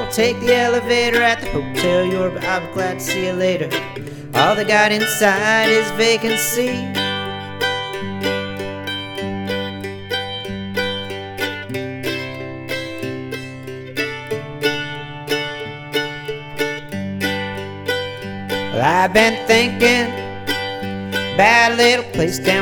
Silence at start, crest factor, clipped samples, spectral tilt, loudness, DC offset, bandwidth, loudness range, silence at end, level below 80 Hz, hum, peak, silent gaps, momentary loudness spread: 0 s; 20 dB; under 0.1%; -3.5 dB/octave; -18 LUFS; under 0.1%; 18 kHz; 9 LU; 0 s; -46 dBFS; none; 0 dBFS; none; 13 LU